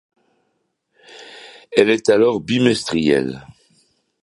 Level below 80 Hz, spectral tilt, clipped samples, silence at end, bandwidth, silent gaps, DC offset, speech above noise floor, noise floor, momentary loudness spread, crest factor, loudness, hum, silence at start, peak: -54 dBFS; -5 dB/octave; under 0.1%; 0.75 s; 11.5 kHz; none; under 0.1%; 54 dB; -70 dBFS; 23 LU; 20 dB; -17 LUFS; none; 1.15 s; 0 dBFS